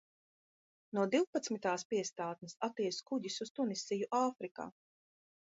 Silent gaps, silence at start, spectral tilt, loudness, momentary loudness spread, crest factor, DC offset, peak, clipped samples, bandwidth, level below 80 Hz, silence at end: 1.27-1.33 s, 1.85-1.90 s, 3.50-3.55 s, 4.51-4.55 s; 0.95 s; -4 dB/octave; -38 LUFS; 9 LU; 18 dB; under 0.1%; -20 dBFS; under 0.1%; 7.6 kHz; -86 dBFS; 0.7 s